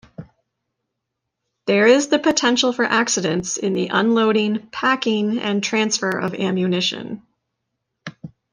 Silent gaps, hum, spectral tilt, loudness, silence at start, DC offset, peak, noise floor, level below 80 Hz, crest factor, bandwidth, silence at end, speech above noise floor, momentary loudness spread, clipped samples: none; none; -3.5 dB/octave; -18 LUFS; 0.2 s; under 0.1%; -2 dBFS; -79 dBFS; -62 dBFS; 18 dB; 10 kHz; 0.25 s; 61 dB; 15 LU; under 0.1%